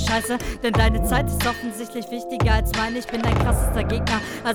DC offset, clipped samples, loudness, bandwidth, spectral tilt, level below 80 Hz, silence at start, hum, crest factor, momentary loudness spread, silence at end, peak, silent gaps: under 0.1%; under 0.1%; -23 LUFS; over 20 kHz; -5 dB/octave; -26 dBFS; 0 s; none; 18 dB; 10 LU; 0 s; -4 dBFS; none